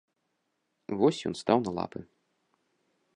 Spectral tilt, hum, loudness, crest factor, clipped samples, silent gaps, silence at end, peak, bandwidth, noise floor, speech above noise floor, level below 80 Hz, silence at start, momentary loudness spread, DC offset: -6 dB/octave; none; -29 LUFS; 24 dB; under 0.1%; none; 1.1 s; -8 dBFS; 11 kHz; -79 dBFS; 51 dB; -66 dBFS; 0.9 s; 16 LU; under 0.1%